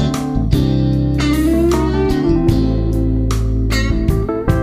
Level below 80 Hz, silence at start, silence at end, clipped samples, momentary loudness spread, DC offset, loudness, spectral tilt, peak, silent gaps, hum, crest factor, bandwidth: -20 dBFS; 0 s; 0 s; under 0.1%; 3 LU; under 0.1%; -16 LUFS; -7 dB/octave; -2 dBFS; none; none; 12 dB; 15.5 kHz